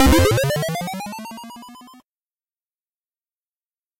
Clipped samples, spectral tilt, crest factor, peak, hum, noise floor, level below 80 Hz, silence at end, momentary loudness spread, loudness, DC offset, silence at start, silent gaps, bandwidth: under 0.1%; -5 dB/octave; 22 dB; -2 dBFS; none; under -90 dBFS; -32 dBFS; 2.05 s; 23 LU; -20 LUFS; under 0.1%; 0 s; none; 16 kHz